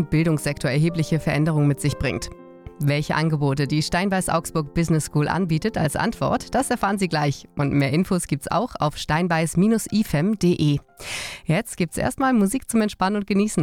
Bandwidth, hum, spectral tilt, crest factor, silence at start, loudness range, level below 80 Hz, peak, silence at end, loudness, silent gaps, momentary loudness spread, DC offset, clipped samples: 16 kHz; none; -6 dB/octave; 12 dB; 0 s; 1 LU; -44 dBFS; -10 dBFS; 0 s; -22 LUFS; none; 6 LU; under 0.1%; under 0.1%